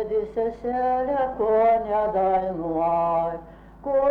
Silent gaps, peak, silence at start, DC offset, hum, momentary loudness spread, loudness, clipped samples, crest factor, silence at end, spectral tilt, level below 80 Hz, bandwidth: none; -12 dBFS; 0 s; under 0.1%; none; 7 LU; -23 LUFS; under 0.1%; 12 dB; 0 s; -9 dB/octave; -48 dBFS; 4.8 kHz